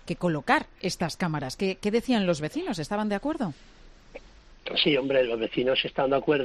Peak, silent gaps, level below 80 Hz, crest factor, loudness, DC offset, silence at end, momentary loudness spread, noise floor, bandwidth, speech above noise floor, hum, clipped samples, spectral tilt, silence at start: -8 dBFS; none; -52 dBFS; 20 dB; -27 LUFS; under 0.1%; 0 s; 7 LU; -48 dBFS; 14 kHz; 22 dB; none; under 0.1%; -5 dB/octave; 0.05 s